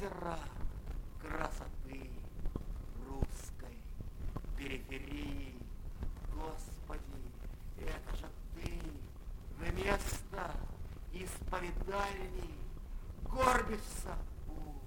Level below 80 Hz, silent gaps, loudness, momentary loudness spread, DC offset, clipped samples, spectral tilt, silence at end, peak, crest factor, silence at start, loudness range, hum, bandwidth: -44 dBFS; none; -43 LUFS; 14 LU; under 0.1%; under 0.1%; -5 dB/octave; 0 s; -14 dBFS; 26 dB; 0 s; 8 LU; none; 16.5 kHz